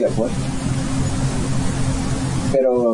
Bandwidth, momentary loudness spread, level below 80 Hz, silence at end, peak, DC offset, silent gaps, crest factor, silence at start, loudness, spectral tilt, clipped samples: 11 kHz; 5 LU; -30 dBFS; 0 s; -6 dBFS; 1%; none; 14 dB; 0 s; -21 LUFS; -6 dB/octave; under 0.1%